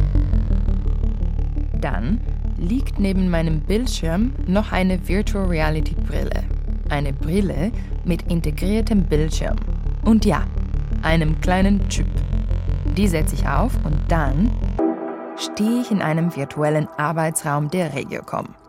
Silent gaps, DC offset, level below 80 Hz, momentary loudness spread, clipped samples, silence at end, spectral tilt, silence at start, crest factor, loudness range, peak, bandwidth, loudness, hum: none; under 0.1%; -22 dBFS; 7 LU; under 0.1%; 0.2 s; -6.5 dB/octave; 0 s; 14 dB; 2 LU; -6 dBFS; 15.5 kHz; -22 LUFS; none